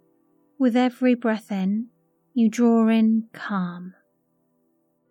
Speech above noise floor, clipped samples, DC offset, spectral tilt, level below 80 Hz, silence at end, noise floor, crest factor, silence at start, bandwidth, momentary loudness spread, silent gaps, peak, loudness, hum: 48 dB; under 0.1%; under 0.1%; -7 dB/octave; under -90 dBFS; 1.2 s; -69 dBFS; 14 dB; 0.6 s; 8.6 kHz; 13 LU; none; -8 dBFS; -22 LUFS; none